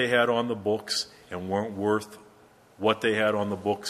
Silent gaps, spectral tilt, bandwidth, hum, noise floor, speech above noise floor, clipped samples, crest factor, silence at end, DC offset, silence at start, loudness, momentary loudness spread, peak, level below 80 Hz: none; -4 dB/octave; 14.5 kHz; none; -56 dBFS; 29 dB; under 0.1%; 20 dB; 0 s; under 0.1%; 0 s; -27 LUFS; 7 LU; -8 dBFS; -60 dBFS